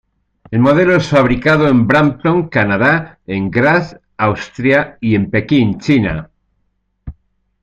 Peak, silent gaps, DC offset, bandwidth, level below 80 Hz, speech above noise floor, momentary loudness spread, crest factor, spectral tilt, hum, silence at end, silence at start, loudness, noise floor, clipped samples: 0 dBFS; none; under 0.1%; 8.6 kHz; -38 dBFS; 52 dB; 7 LU; 14 dB; -7.5 dB/octave; none; 0.5 s; 0.5 s; -13 LUFS; -64 dBFS; under 0.1%